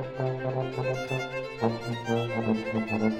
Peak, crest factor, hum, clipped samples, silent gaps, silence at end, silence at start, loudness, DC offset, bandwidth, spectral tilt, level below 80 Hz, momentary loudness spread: -12 dBFS; 18 dB; none; under 0.1%; none; 0 s; 0 s; -30 LUFS; under 0.1%; 13.5 kHz; -7 dB/octave; -58 dBFS; 3 LU